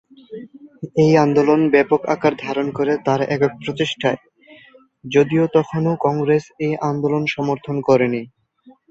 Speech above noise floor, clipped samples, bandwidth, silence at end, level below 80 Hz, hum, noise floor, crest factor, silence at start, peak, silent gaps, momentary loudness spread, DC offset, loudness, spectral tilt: 33 dB; under 0.1%; 7.8 kHz; 0.2 s; -58 dBFS; none; -51 dBFS; 18 dB; 0.3 s; -2 dBFS; none; 10 LU; under 0.1%; -18 LUFS; -7 dB/octave